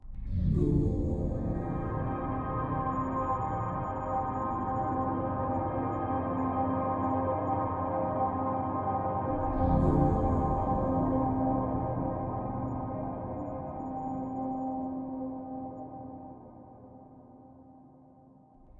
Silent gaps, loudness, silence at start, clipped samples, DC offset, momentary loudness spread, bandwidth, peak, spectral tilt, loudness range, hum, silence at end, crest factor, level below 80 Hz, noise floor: none; -32 LUFS; 0.05 s; under 0.1%; under 0.1%; 10 LU; 7.2 kHz; -14 dBFS; -11 dB/octave; 10 LU; none; 0 s; 16 dB; -42 dBFS; -57 dBFS